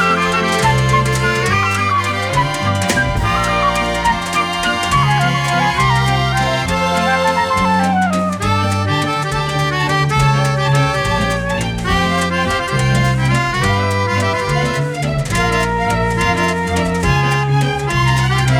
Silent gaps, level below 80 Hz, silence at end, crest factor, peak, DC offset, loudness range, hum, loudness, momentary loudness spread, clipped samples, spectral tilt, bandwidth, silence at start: none; -30 dBFS; 0 s; 14 dB; 0 dBFS; under 0.1%; 1 LU; none; -15 LUFS; 3 LU; under 0.1%; -5 dB/octave; 15 kHz; 0 s